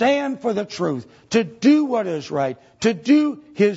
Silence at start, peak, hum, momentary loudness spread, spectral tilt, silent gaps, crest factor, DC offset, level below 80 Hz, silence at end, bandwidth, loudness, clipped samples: 0 s; -4 dBFS; none; 8 LU; -5.5 dB/octave; none; 16 dB; under 0.1%; -64 dBFS; 0 s; 8 kHz; -21 LUFS; under 0.1%